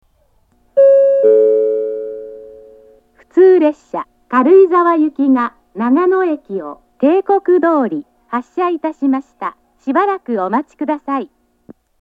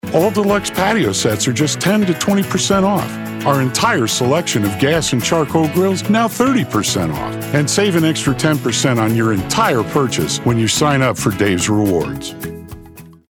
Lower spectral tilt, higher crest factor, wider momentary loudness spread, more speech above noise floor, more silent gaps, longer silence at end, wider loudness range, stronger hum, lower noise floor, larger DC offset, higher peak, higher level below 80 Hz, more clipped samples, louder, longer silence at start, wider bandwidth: first, -8 dB/octave vs -4.5 dB/octave; about the same, 14 dB vs 14 dB; first, 17 LU vs 5 LU; first, 42 dB vs 24 dB; neither; first, 0.75 s vs 0.2 s; first, 6 LU vs 1 LU; neither; first, -56 dBFS vs -39 dBFS; neither; about the same, 0 dBFS vs -2 dBFS; second, -62 dBFS vs -44 dBFS; neither; about the same, -14 LUFS vs -15 LUFS; first, 0.75 s vs 0.05 s; second, 4.8 kHz vs over 20 kHz